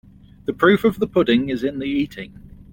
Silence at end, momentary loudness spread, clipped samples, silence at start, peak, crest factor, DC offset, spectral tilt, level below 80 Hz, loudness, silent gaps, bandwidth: 0.1 s; 15 LU; under 0.1%; 0.5 s; -2 dBFS; 18 dB; under 0.1%; -7 dB/octave; -48 dBFS; -19 LUFS; none; 17 kHz